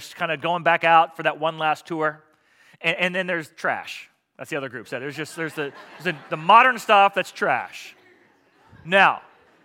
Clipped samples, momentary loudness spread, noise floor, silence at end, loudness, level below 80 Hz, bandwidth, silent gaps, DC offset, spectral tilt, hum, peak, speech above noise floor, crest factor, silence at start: under 0.1%; 15 LU; -58 dBFS; 0.45 s; -21 LUFS; -76 dBFS; 16.5 kHz; none; under 0.1%; -4 dB/octave; none; 0 dBFS; 37 dB; 22 dB; 0 s